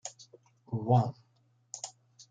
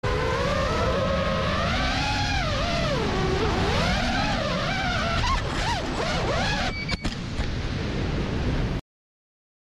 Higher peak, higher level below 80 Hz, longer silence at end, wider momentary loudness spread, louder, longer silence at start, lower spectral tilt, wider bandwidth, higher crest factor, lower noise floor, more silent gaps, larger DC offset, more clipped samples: about the same, -14 dBFS vs -12 dBFS; second, -76 dBFS vs -32 dBFS; second, 0.4 s vs 0.85 s; first, 18 LU vs 5 LU; second, -32 LUFS vs -25 LUFS; about the same, 0.05 s vs 0.05 s; first, -6.5 dB/octave vs -5 dB/octave; second, 9.4 kHz vs 13 kHz; first, 20 dB vs 14 dB; second, -69 dBFS vs under -90 dBFS; neither; neither; neither